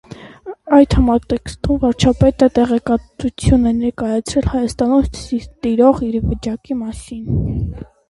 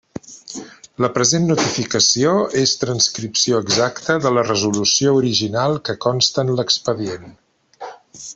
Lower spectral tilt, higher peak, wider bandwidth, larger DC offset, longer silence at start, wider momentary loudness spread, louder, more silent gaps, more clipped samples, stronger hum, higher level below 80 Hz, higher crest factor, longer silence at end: first, -7 dB/octave vs -3.5 dB/octave; about the same, 0 dBFS vs -2 dBFS; first, 11.5 kHz vs 8.4 kHz; neither; about the same, 0.1 s vs 0.15 s; second, 11 LU vs 19 LU; about the same, -16 LUFS vs -17 LUFS; neither; neither; neither; first, -28 dBFS vs -56 dBFS; about the same, 16 dB vs 18 dB; first, 0.25 s vs 0 s